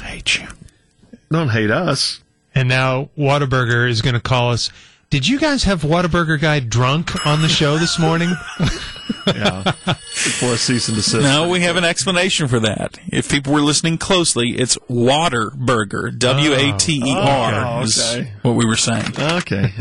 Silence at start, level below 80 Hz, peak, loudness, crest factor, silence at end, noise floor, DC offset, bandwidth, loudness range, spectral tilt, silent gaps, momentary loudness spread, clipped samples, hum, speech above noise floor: 0 s; -40 dBFS; -2 dBFS; -16 LUFS; 14 dB; 0 s; -48 dBFS; under 0.1%; 11.5 kHz; 2 LU; -4 dB/octave; none; 7 LU; under 0.1%; none; 32 dB